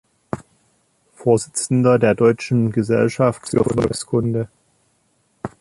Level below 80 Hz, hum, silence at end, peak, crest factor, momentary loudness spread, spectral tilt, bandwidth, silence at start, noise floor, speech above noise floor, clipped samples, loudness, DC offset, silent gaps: -50 dBFS; none; 0.15 s; -2 dBFS; 16 dB; 17 LU; -6.5 dB/octave; 11.5 kHz; 0.35 s; -63 dBFS; 46 dB; under 0.1%; -18 LUFS; under 0.1%; none